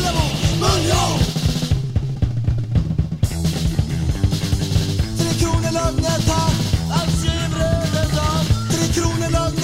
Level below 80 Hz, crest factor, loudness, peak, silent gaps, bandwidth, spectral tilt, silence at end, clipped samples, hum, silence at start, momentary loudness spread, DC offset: -26 dBFS; 14 dB; -19 LUFS; -4 dBFS; none; 16 kHz; -5 dB/octave; 0 s; under 0.1%; none; 0 s; 4 LU; under 0.1%